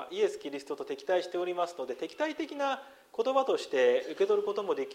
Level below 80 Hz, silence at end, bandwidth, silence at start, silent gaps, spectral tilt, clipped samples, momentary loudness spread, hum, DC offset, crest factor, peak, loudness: -80 dBFS; 0 s; 14.5 kHz; 0 s; none; -3.5 dB/octave; under 0.1%; 11 LU; none; under 0.1%; 16 dB; -14 dBFS; -31 LUFS